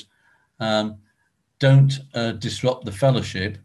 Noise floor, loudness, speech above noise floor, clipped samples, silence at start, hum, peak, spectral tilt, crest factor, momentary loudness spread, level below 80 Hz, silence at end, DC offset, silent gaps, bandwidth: -69 dBFS; -21 LUFS; 49 dB; under 0.1%; 0.6 s; none; -4 dBFS; -6.5 dB/octave; 18 dB; 11 LU; -50 dBFS; 0.1 s; under 0.1%; none; 11.5 kHz